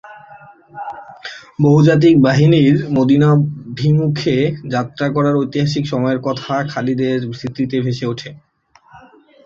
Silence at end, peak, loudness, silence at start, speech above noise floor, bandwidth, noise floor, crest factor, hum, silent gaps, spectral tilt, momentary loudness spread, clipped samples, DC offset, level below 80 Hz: 0.45 s; -2 dBFS; -15 LUFS; 0.05 s; 35 dB; 7.4 kHz; -49 dBFS; 14 dB; none; none; -7.5 dB/octave; 19 LU; under 0.1%; under 0.1%; -50 dBFS